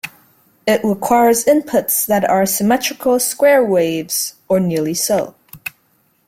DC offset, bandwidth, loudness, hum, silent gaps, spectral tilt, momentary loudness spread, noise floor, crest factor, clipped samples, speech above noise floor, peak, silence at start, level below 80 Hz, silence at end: under 0.1%; 16.5 kHz; -15 LUFS; none; none; -4 dB/octave; 15 LU; -59 dBFS; 14 dB; under 0.1%; 45 dB; -2 dBFS; 0.05 s; -56 dBFS; 0.6 s